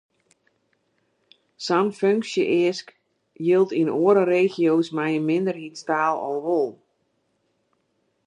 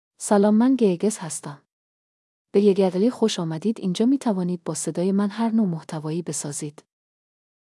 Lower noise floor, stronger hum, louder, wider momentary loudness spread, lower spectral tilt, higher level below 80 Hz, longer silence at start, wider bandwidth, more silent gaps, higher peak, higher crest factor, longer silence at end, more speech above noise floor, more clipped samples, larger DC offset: second, -71 dBFS vs under -90 dBFS; neither; about the same, -22 LUFS vs -22 LUFS; second, 9 LU vs 12 LU; about the same, -6 dB/octave vs -6 dB/octave; about the same, -78 dBFS vs -82 dBFS; first, 1.6 s vs 0.2 s; second, 10 kHz vs 12 kHz; second, none vs 1.72-2.45 s; about the same, -6 dBFS vs -8 dBFS; about the same, 18 dB vs 16 dB; first, 1.5 s vs 0.95 s; second, 50 dB vs over 68 dB; neither; neither